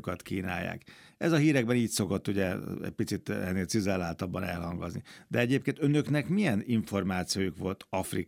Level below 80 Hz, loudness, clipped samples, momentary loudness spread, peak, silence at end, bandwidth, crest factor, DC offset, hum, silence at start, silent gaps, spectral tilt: -64 dBFS; -31 LUFS; under 0.1%; 9 LU; -12 dBFS; 0.05 s; 16.5 kHz; 18 dB; under 0.1%; none; 0.05 s; none; -5.5 dB/octave